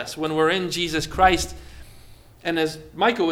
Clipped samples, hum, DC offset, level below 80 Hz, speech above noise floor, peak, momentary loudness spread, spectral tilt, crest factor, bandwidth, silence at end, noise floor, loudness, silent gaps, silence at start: under 0.1%; none; under 0.1%; -40 dBFS; 24 dB; -2 dBFS; 11 LU; -4 dB/octave; 20 dB; 16.5 kHz; 0 s; -46 dBFS; -22 LUFS; none; 0 s